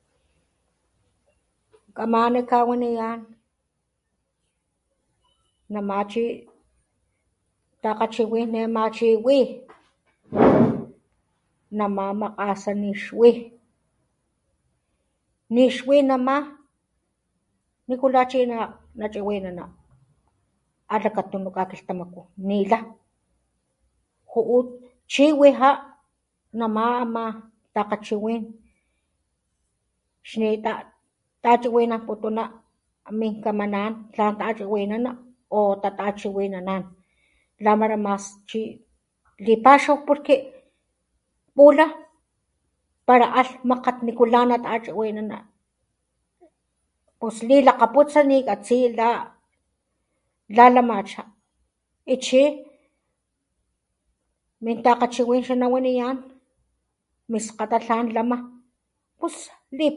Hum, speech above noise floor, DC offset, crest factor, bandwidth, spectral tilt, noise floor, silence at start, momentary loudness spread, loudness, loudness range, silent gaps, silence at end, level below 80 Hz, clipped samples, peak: none; 56 dB; under 0.1%; 24 dB; 11 kHz; -5.5 dB/octave; -76 dBFS; 1.95 s; 16 LU; -21 LUFS; 9 LU; none; 0 s; -62 dBFS; under 0.1%; 0 dBFS